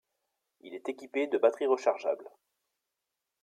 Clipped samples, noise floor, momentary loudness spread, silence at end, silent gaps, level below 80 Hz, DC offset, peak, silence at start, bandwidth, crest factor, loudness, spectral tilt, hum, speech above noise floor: under 0.1%; -87 dBFS; 13 LU; 1.15 s; none; -88 dBFS; under 0.1%; -12 dBFS; 0.65 s; 9.6 kHz; 22 dB; -31 LUFS; -3.5 dB/octave; none; 56 dB